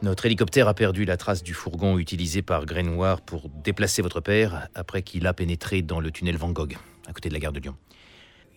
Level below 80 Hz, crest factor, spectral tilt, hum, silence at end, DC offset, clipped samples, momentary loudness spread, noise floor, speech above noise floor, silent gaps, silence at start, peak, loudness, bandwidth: -40 dBFS; 20 dB; -5.5 dB/octave; none; 0.8 s; under 0.1%; under 0.1%; 12 LU; -53 dBFS; 28 dB; none; 0 s; -6 dBFS; -25 LUFS; 17.5 kHz